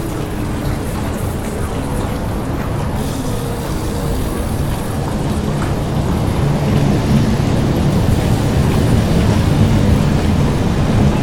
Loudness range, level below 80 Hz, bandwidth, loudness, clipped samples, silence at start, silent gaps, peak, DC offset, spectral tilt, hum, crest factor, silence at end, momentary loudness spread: 6 LU; -22 dBFS; 18 kHz; -17 LUFS; under 0.1%; 0 s; none; 0 dBFS; under 0.1%; -7 dB/octave; none; 14 dB; 0 s; 7 LU